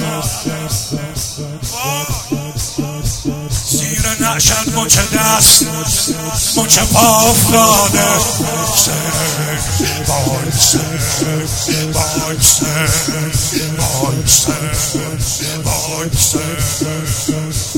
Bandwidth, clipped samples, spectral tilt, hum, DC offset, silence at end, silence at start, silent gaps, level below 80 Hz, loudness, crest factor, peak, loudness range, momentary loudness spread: over 20 kHz; 0.1%; -3 dB/octave; none; under 0.1%; 0 s; 0 s; none; -30 dBFS; -13 LUFS; 14 dB; 0 dBFS; 7 LU; 11 LU